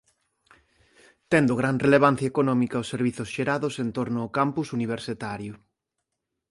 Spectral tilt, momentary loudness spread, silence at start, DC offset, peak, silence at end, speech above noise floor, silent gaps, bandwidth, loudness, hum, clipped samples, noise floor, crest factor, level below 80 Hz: -6.5 dB/octave; 12 LU; 1.3 s; under 0.1%; -6 dBFS; 0.95 s; 58 dB; none; 11.5 kHz; -25 LUFS; none; under 0.1%; -82 dBFS; 20 dB; -60 dBFS